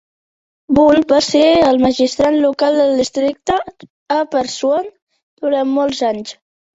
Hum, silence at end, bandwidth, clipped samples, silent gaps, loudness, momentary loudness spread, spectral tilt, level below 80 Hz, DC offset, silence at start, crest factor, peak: none; 0.45 s; 8 kHz; under 0.1%; 3.90-4.06 s, 5.02-5.07 s, 5.23-5.37 s; -14 LUFS; 9 LU; -4 dB/octave; -48 dBFS; under 0.1%; 0.7 s; 14 dB; -2 dBFS